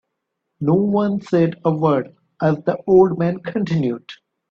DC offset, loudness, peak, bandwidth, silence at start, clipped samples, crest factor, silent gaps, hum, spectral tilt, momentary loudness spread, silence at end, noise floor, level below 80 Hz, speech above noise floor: under 0.1%; -19 LUFS; -2 dBFS; 7 kHz; 0.6 s; under 0.1%; 16 dB; none; none; -9.5 dB/octave; 10 LU; 0.35 s; -77 dBFS; -58 dBFS; 59 dB